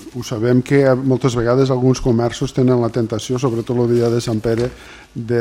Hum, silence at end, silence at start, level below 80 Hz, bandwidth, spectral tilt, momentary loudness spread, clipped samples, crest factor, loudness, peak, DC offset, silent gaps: none; 0 s; 0 s; -40 dBFS; 15.5 kHz; -7 dB/octave; 7 LU; under 0.1%; 14 dB; -17 LUFS; -2 dBFS; under 0.1%; none